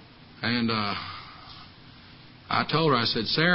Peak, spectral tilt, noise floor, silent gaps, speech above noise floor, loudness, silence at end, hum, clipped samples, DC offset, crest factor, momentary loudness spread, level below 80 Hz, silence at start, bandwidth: -8 dBFS; -9 dB/octave; -49 dBFS; none; 25 dB; -26 LUFS; 0 s; none; under 0.1%; under 0.1%; 20 dB; 21 LU; -58 dBFS; 0 s; 5.8 kHz